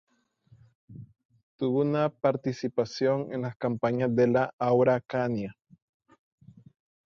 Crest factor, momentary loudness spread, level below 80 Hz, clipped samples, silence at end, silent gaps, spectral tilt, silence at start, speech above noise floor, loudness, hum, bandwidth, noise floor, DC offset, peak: 18 dB; 11 LU; -68 dBFS; under 0.1%; 1.6 s; 1.25-1.29 s, 1.43-1.59 s, 3.56-3.60 s, 4.53-4.58 s; -7.5 dB/octave; 0.9 s; 35 dB; -27 LUFS; none; 7.2 kHz; -62 dBFS; under 0.1%; -10 dBFS